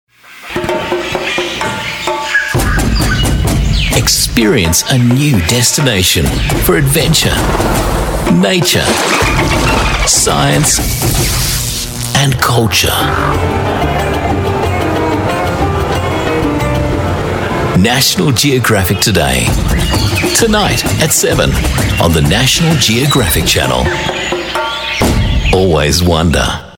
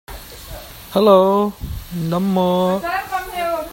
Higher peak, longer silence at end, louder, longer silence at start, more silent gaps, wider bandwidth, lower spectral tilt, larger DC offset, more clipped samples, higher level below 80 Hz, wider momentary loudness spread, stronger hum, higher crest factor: about the same, 0 dBFS vs 0 dBFS; about the same, 0 s vs 0 s; first, -11 LUFS vs -18 LUFS; first, 0.3 s vs 0.1 s; neither; first, 19 kHz vs 16.5 kHz; second, -4 dB/octave vs -6.5 dB/octave; neither; neither; first, -20 dBFS vs -40 dBFS; second, 6 LU vs 22 LU; neither; second, 12 dB vs 18 dB